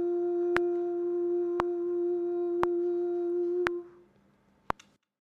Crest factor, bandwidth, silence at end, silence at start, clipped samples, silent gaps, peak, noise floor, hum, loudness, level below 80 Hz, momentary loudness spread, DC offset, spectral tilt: 24 dB; 6.6 kHz; 1.45 s; 0 s; under 0.1%; none; -6 dBFS; -66 dBFS; none; -31 LUFS; -62 dBFS; 9 LU; under 0.1%; -6.5 dB/octave